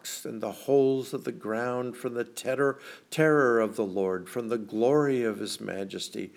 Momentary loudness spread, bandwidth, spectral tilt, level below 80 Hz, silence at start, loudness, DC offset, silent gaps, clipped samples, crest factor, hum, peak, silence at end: 11 LU; 17 kHz; -5 dB/octave; -84 dBFS; 0.05 s; -28 LUFS; under 0.1%; none; under 0.1%; 18 dB; none; -10 dBFS; 0.1 s